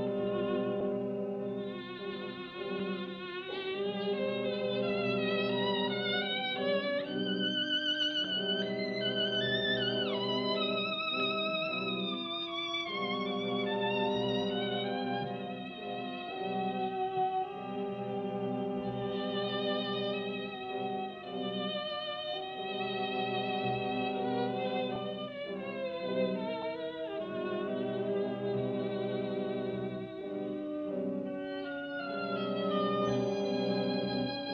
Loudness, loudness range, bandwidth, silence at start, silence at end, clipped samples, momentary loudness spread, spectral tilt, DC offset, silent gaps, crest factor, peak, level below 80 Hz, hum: -34 LUFS; 5 LU; 6.6 kHz; 0 s; 0 s; under 0.1%; 8 LU; -6 dB/octave; under 0.1%; none; 14 dB; -20 dBFS; -70 dBFS; none